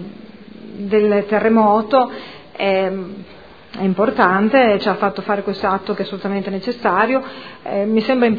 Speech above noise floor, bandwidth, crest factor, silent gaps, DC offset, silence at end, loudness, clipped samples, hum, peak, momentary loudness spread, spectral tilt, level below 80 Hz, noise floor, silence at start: 21 dB; 5 kHz; 18 dB; none; 0.4%; 0 s; -17 LUFS; under 0.1%; none; 0 dBFS; 19 LU; -8.5 dB/octave; -54 dBFS; -38 dBFS; 0 s